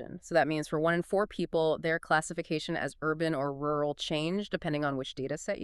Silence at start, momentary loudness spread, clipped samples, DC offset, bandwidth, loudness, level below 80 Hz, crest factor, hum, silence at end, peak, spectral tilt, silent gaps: 0 s; 6 LU; under 0.1%; under 0.1%; 12.5 kHz; -31 LUFS; -60 dBFS; 18 dB; none; 0 s; -14 dBFS; -5 dB/octave; none